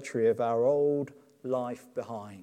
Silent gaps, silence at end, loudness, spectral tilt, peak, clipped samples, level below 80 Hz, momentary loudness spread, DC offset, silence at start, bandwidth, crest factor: none; 0 s; -29 LUFS; -7 dB/octave; -16 dBFS; under 0.1%; -82 dBFS; 15 LU; under 0.1%; 0 s; 10 kHz; 14 dB